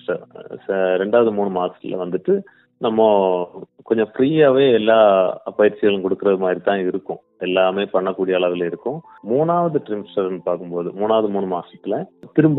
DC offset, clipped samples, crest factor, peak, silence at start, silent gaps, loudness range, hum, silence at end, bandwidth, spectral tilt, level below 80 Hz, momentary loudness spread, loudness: under 0.1%; under 0.1%; 18 dB; 0 dBFS; 0.1 s; none; 5 LU; none; 0 s; 4.1 kHz; -10.5 dB/octave; -66 dBFS; 13 LU; -19 LUFS